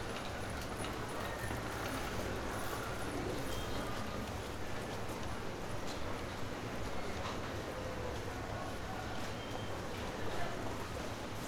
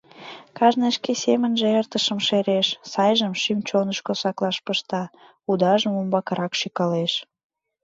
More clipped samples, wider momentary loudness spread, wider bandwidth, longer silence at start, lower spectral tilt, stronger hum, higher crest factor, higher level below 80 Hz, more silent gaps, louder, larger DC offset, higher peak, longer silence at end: neither; second, 3 LU vs 9 LU; first, 19 kHz vs 7.8 kHz; second, 0 s vs 0.15 s; about the same, -4.5 dB/octave vs -4.5 dB/octave; neither; about the same, 14 dB vs 18 dB; first, -52 dBFS vs -72 dBFS; neither; second, -41 LUFS vs -22 LUFS; neither; second, -26 dBFS vs -4 dBFS; second, 0 s vs 0.6 s